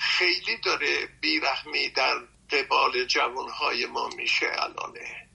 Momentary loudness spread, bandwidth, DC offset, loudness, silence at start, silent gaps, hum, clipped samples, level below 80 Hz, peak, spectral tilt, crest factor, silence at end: 7 LU; 11.5 kHz; under 0.1%; -25 LUFS; 0 s; none; none; under 0.1%; -62 dBFS; -10 dBFS; -1 dB/octave; 18 dB; 0.1 s